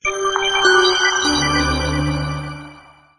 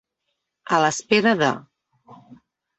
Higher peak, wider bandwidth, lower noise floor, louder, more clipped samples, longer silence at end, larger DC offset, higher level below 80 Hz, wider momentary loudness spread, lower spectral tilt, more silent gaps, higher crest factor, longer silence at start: first, 0 dBFS vs -4 dBFS; first, 10 kHz vs 8.4 kHz; second, -44 dBFS vs -78 dBFS; first, -16 LUFS vs -20 LUFS; neither; about the same, 0.4 s vs 0.45 s; neither; first, -32 dBFS vs -66 dBFS; first, 14 LU vs 5 LU; about the same, -3 dB/octave vs -4 dB/octave; neither; about the same, 18 dB vs 20 dB; second, 0.05 s vs 0.7 s